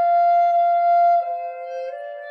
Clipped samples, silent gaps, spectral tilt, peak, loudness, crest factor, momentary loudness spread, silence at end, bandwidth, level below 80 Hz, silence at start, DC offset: under 0.1%; none; 0 dB/octave; -12 dBFS; -18 LUFS; 8 dB; 14 LU; 0 s; 5.2 kHz; -82 dBFS; 0 s; under 0.1%